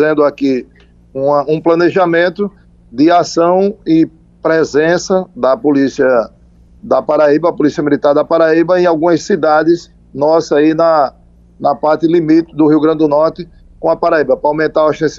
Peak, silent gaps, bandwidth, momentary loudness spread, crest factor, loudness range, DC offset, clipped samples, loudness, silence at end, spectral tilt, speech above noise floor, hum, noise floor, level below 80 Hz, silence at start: 0 dBFS; none; 7.6 kHz; 8 LU; 12 dB; 2 LU; under 0.1%; under 0.1%; -12 LUFS; 0 s; -6 dB/octave; 32 dB; none; -43 dBFS; -46 dBFS; 0 s